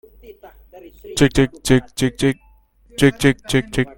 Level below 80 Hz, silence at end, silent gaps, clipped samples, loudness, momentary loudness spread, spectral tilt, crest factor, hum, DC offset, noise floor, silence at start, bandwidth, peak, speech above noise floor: -38 dBFS; 0.1 s; none; under 0.1%; -18 LUFS; 10 LU; -5.5 dB/octave; 20 dB; none; under 0.1%; -51 dBFS; 0.3 s; 17 kHz; 0 dBFS; 34 dB